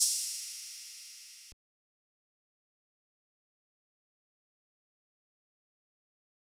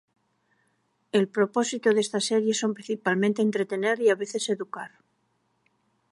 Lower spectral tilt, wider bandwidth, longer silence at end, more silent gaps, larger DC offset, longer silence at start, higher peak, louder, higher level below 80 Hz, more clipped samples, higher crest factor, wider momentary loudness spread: second, 5.5 dB/octave vs -4 dB/octave; first, over 20 kHz vs 11.5 kHz; first, 5.05 s vs 1.25 s; neither; neither; second, 0 s vs 1.15 s; second, -14 dBFS vs -8 dBFS; second, -36 LUFS vs -25 LUFS; about the same, -82 dBFS vs -80 dBFS; neither; first, 30 dB vs 18 dB; first, 20 LU vs 6 LU